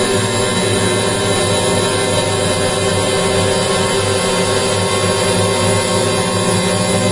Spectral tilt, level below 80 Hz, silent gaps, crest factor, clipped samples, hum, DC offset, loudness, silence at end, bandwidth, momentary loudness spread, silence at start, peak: -3.5 dB/octave; -38 dBFS; none; 14 dB; under 0.1%; none; 0.2%; -14 LUFS; 0 s; 11.5 kHz; 1 LU; 0 s; 0 dBFS